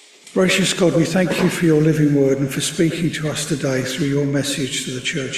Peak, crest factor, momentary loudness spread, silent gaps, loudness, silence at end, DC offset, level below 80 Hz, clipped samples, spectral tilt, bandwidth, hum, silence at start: -4 dBFS; 14 dB; 6 LU; none; -18 LUFS; 0 s; under 0.1%; -50 dBFS; under 0.1%; -5 dB/octave; 15.5 kHz; none; 0.25 s